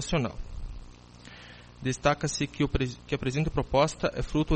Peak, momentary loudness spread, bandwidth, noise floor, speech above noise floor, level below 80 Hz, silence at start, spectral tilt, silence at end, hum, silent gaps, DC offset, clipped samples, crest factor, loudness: -10 dBFS; 21 LU; 8.8 kHz; -49 dBFS; 21 dB; -40 dBFS; 0 s; -5.5 dB/octave; 0 s; 60 Hz at -50 dBFS; none; under 0.1%; under 0.1%; 20 dB; -29 LUFS